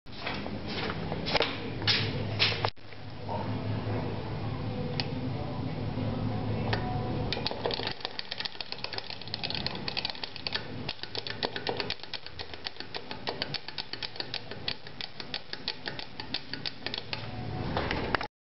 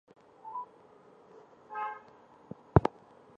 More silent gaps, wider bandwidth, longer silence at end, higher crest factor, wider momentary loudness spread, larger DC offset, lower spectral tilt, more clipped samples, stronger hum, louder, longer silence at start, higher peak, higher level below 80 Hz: neither; second, 6.2 kHz vs 8.4 kHz; second, 0.2 s vs 0.5 s; about the same, 28 dB vs 32 dB; second, 9 LU vs 23 LU; first, 0.8% vs under 0.1%; second, -3 dB/octave vs -9.5 dB/octave; neither; neither; about the same, -33 LUFS vs -33 LUFS; second, 0.05 s vs 0.45 s; second, -6 dBFS vs -2 dBFS; about the same, -50 dBFS vs -48 dBFS